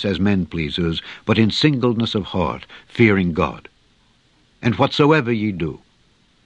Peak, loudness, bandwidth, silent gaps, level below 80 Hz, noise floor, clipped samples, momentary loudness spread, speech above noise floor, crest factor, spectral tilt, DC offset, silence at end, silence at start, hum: 0 dBFS; -19 LUFS; 8.8 kHz; none; -48 dBFS; -58 dBFS; under 0.1%; 12 LU; 39 dB; 18 dB; -7 dB/octave; under 0.1%; 0.7 s; 0 s; none